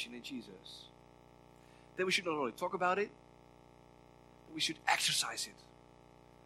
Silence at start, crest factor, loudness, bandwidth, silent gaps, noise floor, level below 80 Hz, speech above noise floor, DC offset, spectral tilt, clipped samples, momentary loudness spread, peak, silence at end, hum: 0 s; 28 dB; -35 LUFS; 16 kHz; none; -61 dBFS; -72 dBFS; 24 dB; under 0.1%; -2 dB/octave; under 0.1%; 20 LU; -12 dBFS; 0.85 s; 60 Hz at -65 dBFS